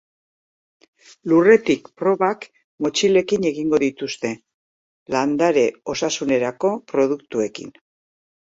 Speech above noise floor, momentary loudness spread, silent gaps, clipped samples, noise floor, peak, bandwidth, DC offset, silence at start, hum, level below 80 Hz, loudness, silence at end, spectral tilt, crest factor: over 71 dB; 12 LU; 2.64-2.78 s, 4.54-5.06 s; under 0.1%; under -90 dBFS; -2 dBFS; 8 kHz; under 0.1%; 1.25 s; none; -62 dBFS; -20 LUFS; 0.8 s; -4.5 dB/octave; 18 dB